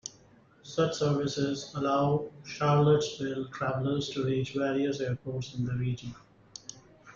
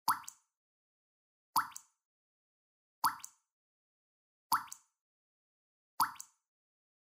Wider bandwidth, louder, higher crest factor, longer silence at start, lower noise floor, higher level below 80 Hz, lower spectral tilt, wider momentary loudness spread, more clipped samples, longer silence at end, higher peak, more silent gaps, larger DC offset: second, 7.6 kHz vs 16 kHz; first, -30 LUFS vs -37 LUFS; second, 16 dB vs 28 dB; about the same, 0.05 s vs 0.05 s; second, -59 dBFS vs under -90 dBFS; first, -62 dBFS vs -86 dBFS; first, -6 dB/octave vs 0 dB/octave; about the same, 18 LU vs 17 LU; neither; second, 0.05 s vs 0.95 s; about the same, -14 dBFS vs -14 dBFS; second, none vs 0.57-1.53 s, 2.05-3.02 s, 3.52-4.50 s, 5.01-5.98 s; neither